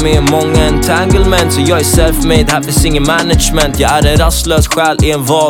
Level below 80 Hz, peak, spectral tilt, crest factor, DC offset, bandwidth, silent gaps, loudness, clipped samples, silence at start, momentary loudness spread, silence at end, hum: -16 dBFS; 0 dBFS; -4.5 dB/octave; 10 dB; under 0.1%; 19 kHz; none; -10 LUFS; under 0.1%; 0 s; 2 LU; 0 s; none